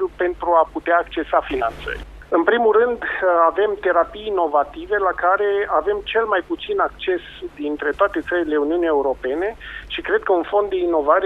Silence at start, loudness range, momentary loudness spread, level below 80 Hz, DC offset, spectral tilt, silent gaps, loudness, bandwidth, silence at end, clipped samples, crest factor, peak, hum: 0 s; 3 LU; 9 LU; -44 dBFS; under 0.1%; -6 dB/octave; none; -20 LUFS; 5.6 kHz; 0 s; under 0.1%; 16 dB; -2 dBFS; none